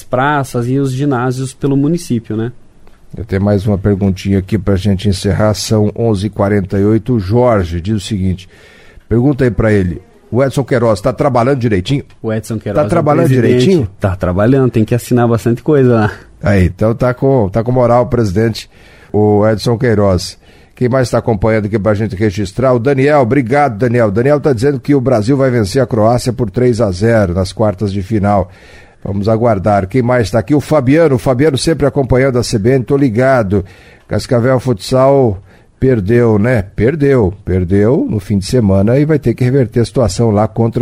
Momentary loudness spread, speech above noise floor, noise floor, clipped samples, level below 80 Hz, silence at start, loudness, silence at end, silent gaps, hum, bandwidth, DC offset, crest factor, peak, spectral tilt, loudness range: 7 LU; 26 dB; -38 dBFS; under 0.1%; -34 dBFS; 0 s; -12 LUFS; 0 s; none; none; 15.5 kHz; under 0.1%; 12 dB; 0 dBFS; -7 dB/octave; 3 LU